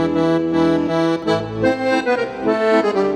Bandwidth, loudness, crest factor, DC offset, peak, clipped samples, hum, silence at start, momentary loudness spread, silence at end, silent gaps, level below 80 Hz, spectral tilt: 10.5 kHz; -18 LUFS; 14 dB; under 0.1%; -4 dBFS; under 0.1%; none; 0 s; 4 LU; 0 s; none; -48 dBFS; -6.5 dB/octave